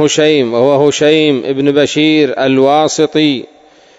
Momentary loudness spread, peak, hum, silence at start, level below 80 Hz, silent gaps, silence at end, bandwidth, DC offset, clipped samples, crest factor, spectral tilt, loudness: 3 LU; 0 dBFS; none; 0 s; -56 dBFS; none; 0.55 s; 8 kHz; under 0.1%; 0.4%; 10 dB; -4.5 dB/octave; -10 LUFS